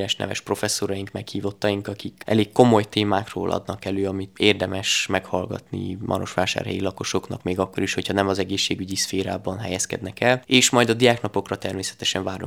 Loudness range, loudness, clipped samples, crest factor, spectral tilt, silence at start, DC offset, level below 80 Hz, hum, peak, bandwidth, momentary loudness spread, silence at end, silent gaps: 4 LU; -23 LUFS; under 0.1%; 22 dB; -4 dB/octave; 0 s; under 0.1%; -60 dBFS; none; 0 dBFS; over 20 kHz; 11 LU; 0 s; none